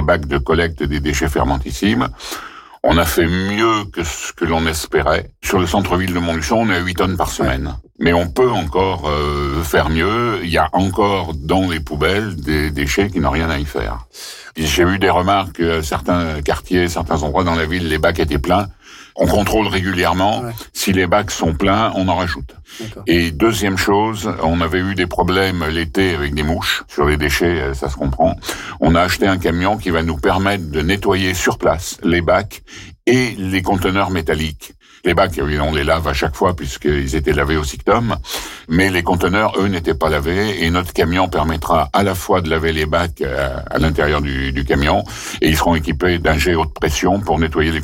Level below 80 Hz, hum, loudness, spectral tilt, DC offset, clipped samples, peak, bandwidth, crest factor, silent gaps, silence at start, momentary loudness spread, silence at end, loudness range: -30 dBFS; none; -17 LUFS; -5 dB/octave; under 0.1%; under 0.1%; -4 dBFS; 17 kHz; 12 dB; none; 0 s; 6 LU; 0 s; 1 LU